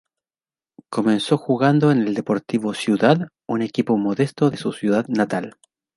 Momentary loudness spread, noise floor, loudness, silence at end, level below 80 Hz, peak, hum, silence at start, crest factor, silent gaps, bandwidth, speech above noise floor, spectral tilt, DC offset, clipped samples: 8 LU; under -90 dBFS; -20 LUFS; 0.45 s; -64 dBFS; -2 dBFS; none; 0.9 s; 18 dB; none; 11.5 kHz; over 71 dB; -7 dB/octave; under 0.1%; under 0.1%